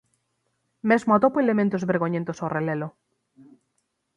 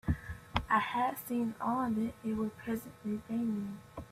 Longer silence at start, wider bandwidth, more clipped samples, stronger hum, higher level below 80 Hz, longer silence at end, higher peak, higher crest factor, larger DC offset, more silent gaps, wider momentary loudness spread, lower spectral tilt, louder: first, 0.85 s vs 0.05 s; second, 9.8 kHz vs 16 kHz; neither; neither; second, -66 dBFS vs -52 dBFS; first, 1.25 s vs 0 s; first, -6 dBFS vs -14 dBFS; about the same, 20 dB vs 22 dB; neither; neither; about the same, 11 LU vs 9 LU; first, -8 dB/octave vs -6 dB/octave; first, -23 LUFS vs -35 LUFS